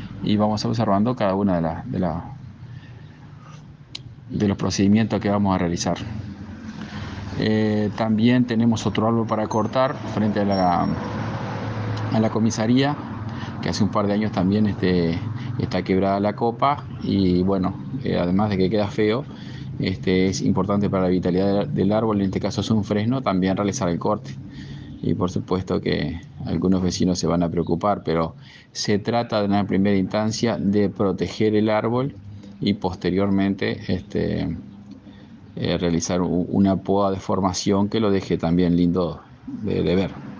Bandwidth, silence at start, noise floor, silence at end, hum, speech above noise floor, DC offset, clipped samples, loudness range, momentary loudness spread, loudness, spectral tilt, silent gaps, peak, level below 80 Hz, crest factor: 7.6 kHz; 0 s; -43 dBFS; 0 s; none; 22 dB; under 0.1%; under 0.1%; 4 LU; 13 LU; -22 LUFS; -6.5 dB/octave; none; -6 dBFS; -50 dBFS; 16 dB